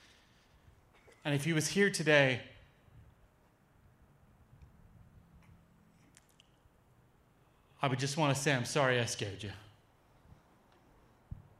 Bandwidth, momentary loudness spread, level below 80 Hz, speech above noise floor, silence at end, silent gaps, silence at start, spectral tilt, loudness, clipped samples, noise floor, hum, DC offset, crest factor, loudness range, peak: 15 kHz; 21 LU; -68 dBFS; 36 dB; 0.25 s; none; 1.25 s; -4.5 dB/octave; -32 LUFS; under 0.1%; -67 dBFS; none; under 0.1%; 26 dB; 7 LU; -12 dBFS